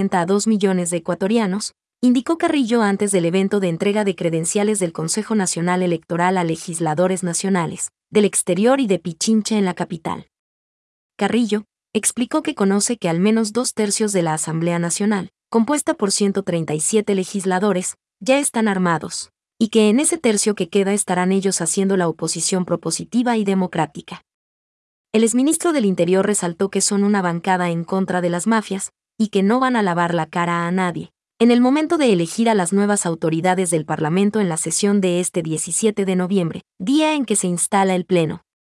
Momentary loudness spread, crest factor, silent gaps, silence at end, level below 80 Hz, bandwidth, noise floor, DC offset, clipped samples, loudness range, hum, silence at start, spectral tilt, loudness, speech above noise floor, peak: 6 LU; 14 dB; 10.39-11.10 s, 24.34-25.05 s; 0.3 s; -66 dBFS; 12 kHz; under -90 dBFS; under 0.1%; under 0.1%; 2 LU; none; 0 s; -4.5 dB/octave; -19 LUFS; over 72 dB; -4 dBFS